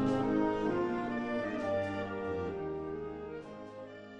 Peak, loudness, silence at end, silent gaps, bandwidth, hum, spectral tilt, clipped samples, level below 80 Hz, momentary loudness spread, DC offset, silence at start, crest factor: -20 dBFS; -35 LUFS; 0 s; none; 9.4 kHz; none; -7.5 dB/octave; under 0.1%; -58 dBFS; 15 LU; under 0.1%; 0 s; 16 dB